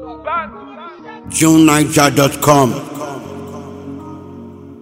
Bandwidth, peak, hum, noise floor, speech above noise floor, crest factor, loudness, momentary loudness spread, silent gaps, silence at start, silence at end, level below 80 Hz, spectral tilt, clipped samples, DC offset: 16.5 kHz; 0 dBFS; none; -33 dBFS; 22 dB; 16 dB; -12 LUFS; 23 LU; none; 0 s; 0 s; -46 dBFS; -4.5 dB/octave; 0.2%; under 0.1%